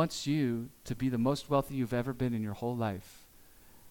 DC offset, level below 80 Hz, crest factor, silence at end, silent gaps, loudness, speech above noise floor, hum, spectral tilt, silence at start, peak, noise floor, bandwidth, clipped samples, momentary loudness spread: under 0.1%; -58 dBFS; 18 dB; 0 s; none; -33 LUFS; 25 dB; none; -6.5 dB/octave; 0 s; -14 dBFS; -57 dBFS; 18 kHz; under 0.1%; 6 LU